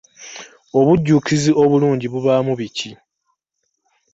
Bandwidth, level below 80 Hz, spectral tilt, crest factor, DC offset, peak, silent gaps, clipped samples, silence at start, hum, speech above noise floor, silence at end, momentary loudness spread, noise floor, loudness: 8 kHz; -52 dBFS; -6.5 dB/octave; 16 dB; under 0.1%; -2 dBFS; none; under 0.1%; 0.2 s; none; 57 dB; 1.2 s; 20 LU; -73 dBFS; -16 LUFS